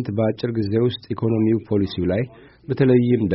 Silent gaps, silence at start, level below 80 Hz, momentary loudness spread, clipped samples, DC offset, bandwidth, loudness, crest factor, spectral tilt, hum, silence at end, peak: none; 0 s; -50 dBFS; 8 LU; under 0.1%; under 0.1%; 5.8 kHz; -21 LUFS; 16 dB; -7.5 dB/octave; none; 0 s; -4 dBFS